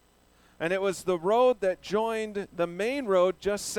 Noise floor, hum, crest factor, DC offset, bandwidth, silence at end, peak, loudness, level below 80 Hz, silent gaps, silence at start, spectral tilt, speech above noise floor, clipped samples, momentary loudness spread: -61 dBFS; none; 16 dB; under 0.1%; 17 kHz; 0 s; -12 dBFS; -27 LUFS; -60 dBFS; none; 0.6 s; -4.5 dB/octave; 35 dB; under 0.1%; 9 LU